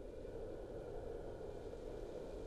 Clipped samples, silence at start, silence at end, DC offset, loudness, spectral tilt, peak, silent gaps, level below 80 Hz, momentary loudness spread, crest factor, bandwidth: under 0.1%; 0 s; 0 s; under 0.1%; -50 LUFS; -7 dB/octave; -36 dBFS; none; -54 dBFS; 1 LU; 12 dB; 13 kHz